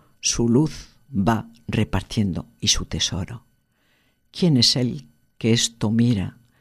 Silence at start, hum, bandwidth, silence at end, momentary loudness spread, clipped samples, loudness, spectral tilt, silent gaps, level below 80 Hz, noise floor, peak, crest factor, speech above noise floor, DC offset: 0.25 s; none; 13.5 kHz; 0.3 s; 15 LU; under 0.1%; -21 LUFS; -4.5 dB/octave; none; -40 dBFS; -64 dBFS; -4 dBFS; 18 dB; 43 dB; under 0.1%